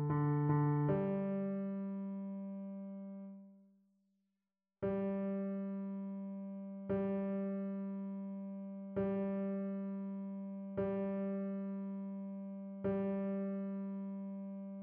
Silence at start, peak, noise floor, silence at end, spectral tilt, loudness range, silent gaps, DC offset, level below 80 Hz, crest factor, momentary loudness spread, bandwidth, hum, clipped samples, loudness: 0 s; -22 dBFS; under -90 dBFS; 0 s; -10.5 dB/octave; 4 LU; none; under 0.1%; -70 dBFS; 18 dB; 12 LU; 3.4 kHz; none; under 0.1%; -40 LUFS